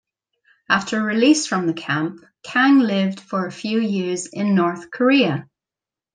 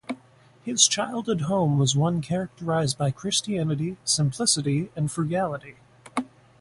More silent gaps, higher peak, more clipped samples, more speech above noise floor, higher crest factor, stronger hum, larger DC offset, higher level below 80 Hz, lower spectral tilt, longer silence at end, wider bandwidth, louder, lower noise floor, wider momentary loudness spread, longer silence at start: neither; about the same, -2 dBFS vs -4 dBFS; neither; first, 70 dB vs 30 dB; about the same, 18 dB vs 22 dB; neither; neither; second, -68 dBFS vs -58 dBFS; about the same, -4.5 dB/octave vs -4 dB/octave; first, 0.7 s vs 0.35 s; second, 10 kHz vs 11.5 kHz; first, -19 LUFS vs -24 LUFS; first, -89 dBFS vs -55 dBFS; second, 10 LU vs 13 LU; first, 0.7 s vs 0.1 s